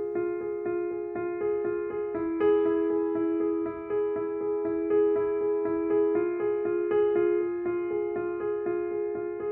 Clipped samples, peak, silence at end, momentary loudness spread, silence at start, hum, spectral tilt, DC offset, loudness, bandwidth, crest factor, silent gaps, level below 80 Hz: under 0.1%; -16 dBFS; 0 s; 7 LU; 0 s; none; -10.5 dB/octave; under 0.1%; -28 LUFS; 3.1 kHz; 12 dB; none; -62 dBFS